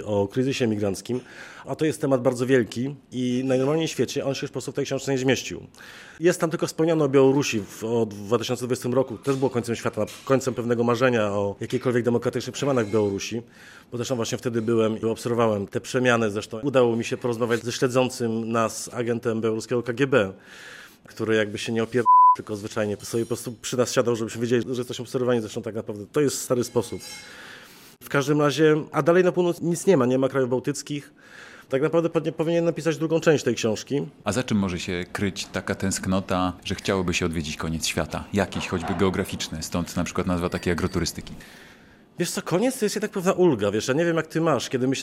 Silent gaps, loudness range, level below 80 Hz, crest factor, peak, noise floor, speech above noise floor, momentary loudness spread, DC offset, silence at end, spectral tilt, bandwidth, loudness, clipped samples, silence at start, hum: none; 4 LU; -56 dBFS; 20 dB; -4 dBFS; -51 dBFS; 27 dB; 10 LU; under 0.1%; 0 s; -5 dB/octave; 16 kHz; -24 LUFS; under 0.1%; 0 s; none